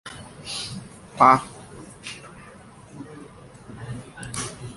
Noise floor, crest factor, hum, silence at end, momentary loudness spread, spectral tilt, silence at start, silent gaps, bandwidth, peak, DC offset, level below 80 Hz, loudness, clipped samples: -46 dBFS; 26 dB; none; 0 s; 28 LU; -4 dB/octave; 0.05 s; none; 11.5 kHz; -2 dBFS; under 0.1%; -54 dBFS; -22 LUFS; under 0.1%